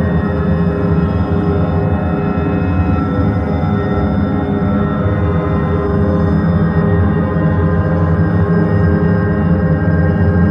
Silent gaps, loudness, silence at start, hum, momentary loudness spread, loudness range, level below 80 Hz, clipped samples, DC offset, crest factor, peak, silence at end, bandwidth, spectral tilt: none; -14 LUFS; 0 s; none; 3 LU; 2 LU; -26 dBFS; under 0.1%; under 0.1%; 12 dB; -2 dBFS; 0 s; 5.4 kHz; -11 dB/octave